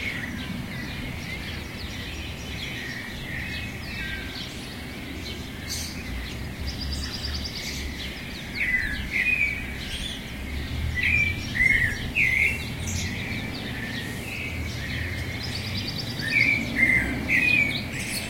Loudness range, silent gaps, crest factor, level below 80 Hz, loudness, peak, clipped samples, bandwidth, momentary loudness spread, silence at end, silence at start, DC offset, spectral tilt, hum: 9 LU; none; 20 dB; -40 dBFS; -26 LUFS; -8 dBFS; under 0.1%; 16.5 kHz; 14 LU; 0 s; 0 s; 0.1%; -3.5 dB/octave; none